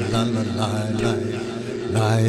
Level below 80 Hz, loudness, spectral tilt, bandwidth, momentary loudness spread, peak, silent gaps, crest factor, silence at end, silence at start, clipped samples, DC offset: -48 dBFS; -23 LUFS; -6 dB/octave; 12.5 kHz; 6 LU; -8 dBFS; none; 14 dB; 0 s; 0 s; under 0.1%; under 0.1%